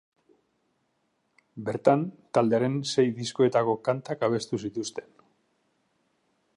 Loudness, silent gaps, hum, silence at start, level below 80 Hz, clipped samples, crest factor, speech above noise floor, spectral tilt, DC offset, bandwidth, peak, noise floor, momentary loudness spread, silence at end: -27 LUFS; none; none; 1.55 s; -72 dBFS; under 0.1%; 24 dB; 48 dB; -6 dB/octave; under 0.1%; 11.5 kHz; -6 dBFS; -74 dBFS; 11 LU; 1.55 s